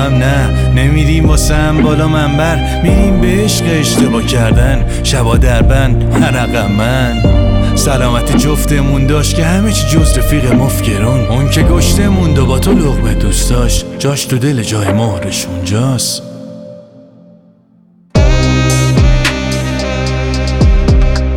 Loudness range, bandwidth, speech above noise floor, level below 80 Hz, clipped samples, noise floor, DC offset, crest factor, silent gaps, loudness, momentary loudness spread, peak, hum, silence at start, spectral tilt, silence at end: 4 LU; 17.5 kHz; 37 dB; -14 dBFS; under 0.1%; -46 dBFS; under 0.1%; 10 dB; none; -11 LUFS; 5 LU; 0 dBFS; none; 0 s; -5.5 dB/octave; 0 s